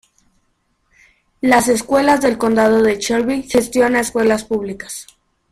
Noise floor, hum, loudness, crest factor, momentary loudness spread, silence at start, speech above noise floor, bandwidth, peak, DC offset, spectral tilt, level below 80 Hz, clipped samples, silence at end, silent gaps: -65 dBFS; none; -15 LUFS; 16 dB; 10 LU; 1.45 s; 49 dB; 15.5 kHz; 0 dBFS; under 0.1%; -4 dB/octave; -48 dBFS; under 0.1%; 0.5 s; none